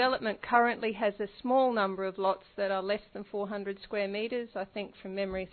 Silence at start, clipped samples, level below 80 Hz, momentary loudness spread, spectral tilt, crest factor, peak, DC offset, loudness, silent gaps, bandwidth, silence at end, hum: 0 s; under 0.1%; -64 dBFS; 11 LU; -2.5 dB/octave; 22 dB; -10 dBFS; under 0.1%; -32 LUFS; none; 4.5 kHz; 0.05 s; none